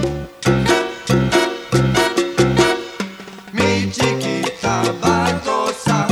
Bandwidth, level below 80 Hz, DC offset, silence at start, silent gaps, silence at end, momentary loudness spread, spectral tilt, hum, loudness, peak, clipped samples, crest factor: 15.5 kHz; -38 dBFS; under 0.1%; 0 s; none; 0 s; 8 LU; -5 dB/octave; none; -17 LUFS; -2 dBFS; under 0.1%; 16 dB